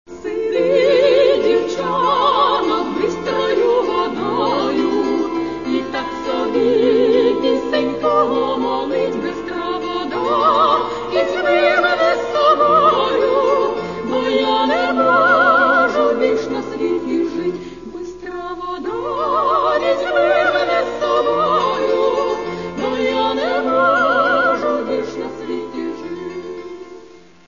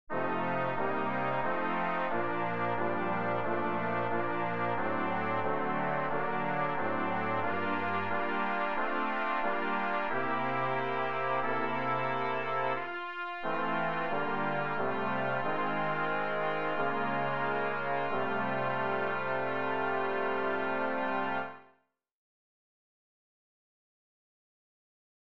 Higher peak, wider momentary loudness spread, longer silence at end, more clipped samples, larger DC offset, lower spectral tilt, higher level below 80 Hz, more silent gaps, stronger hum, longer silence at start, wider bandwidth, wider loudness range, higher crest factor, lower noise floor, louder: first, -2 dBFS vs -18 dBFS; first, 12 LU vs 1 LU; second, 0.4 s vs 3.15 s; neither; second, 0.4% vs 1%; second, -5 dB/octave vs -7.5 dB/octave; first, -50 dBFS vs -68 dBFS; neither; neither; about the same, 0.1 s vs 0.05 s; about the same, 7.4 kHz vs 7 kHz; about the same, 4 LU vs 2 LU; about the same, 14 dB vs 16 dB; second, -42 dBFS vs -70 dBFS; first, -17 LUFS vs -32 LUFS